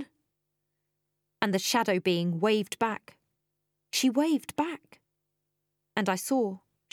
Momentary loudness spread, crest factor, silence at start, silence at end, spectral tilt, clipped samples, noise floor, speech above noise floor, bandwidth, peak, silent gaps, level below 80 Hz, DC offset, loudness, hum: 10 LU; 24 dB; 0 s; 0.35 s; -4.5 dB/octave; under 0.1%; -82 dBFS; 54 dB; 18 kHz; -8 dBFS; none; -78 dBFS; under 0.1%; -28 LUFS; 50 Hz at -65 dBFS